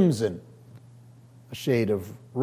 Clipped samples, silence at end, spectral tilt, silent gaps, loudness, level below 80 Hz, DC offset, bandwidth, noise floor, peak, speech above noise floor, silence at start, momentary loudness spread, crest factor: under 0.1%; 0 s; -7 dB/octave; none; -27 LUFS; -58 dBFS; under 0.1%; 16 kHz; -51 dBFS; -10 dBFS; 26 dB; 0 s; 18 LU; 18 dB